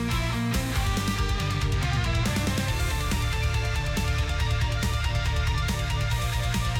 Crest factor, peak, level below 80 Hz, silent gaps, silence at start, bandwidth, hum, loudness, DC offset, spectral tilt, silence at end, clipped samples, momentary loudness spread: 10 dB; -14 dBFS; -30 dBFS; none; 0 s; 17.5 kHz; none; -27 LUFS; under 0.1%; -4.5 dB/octave; 0 s; under 0.1%; 1 LU